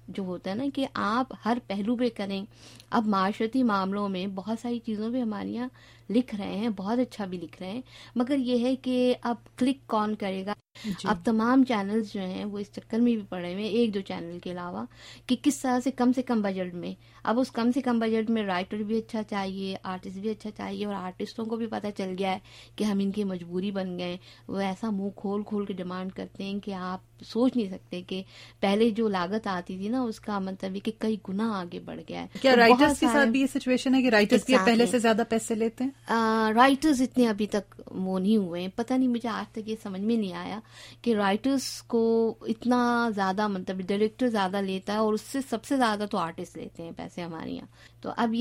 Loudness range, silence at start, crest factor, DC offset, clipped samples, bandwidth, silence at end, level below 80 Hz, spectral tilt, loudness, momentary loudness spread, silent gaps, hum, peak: 8 LU; 0.1 s; 22 dB; under 0.1%; under 0.1%; 16 kHz; 0 s; -60 dBFS; -5.5 dB/octave; -28 LUFS; 14 LU; none; none; -6 dBFS